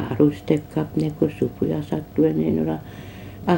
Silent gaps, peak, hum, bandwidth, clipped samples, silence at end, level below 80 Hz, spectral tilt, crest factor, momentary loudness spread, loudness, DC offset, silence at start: none; -4 dBFS; none; 16.5 kHz; under 0.1%; 0 s; -48 dBFS; -8.5 dB/octave; 18 dB; 11 LU; -23 LUFS; under 0.1%; 0 s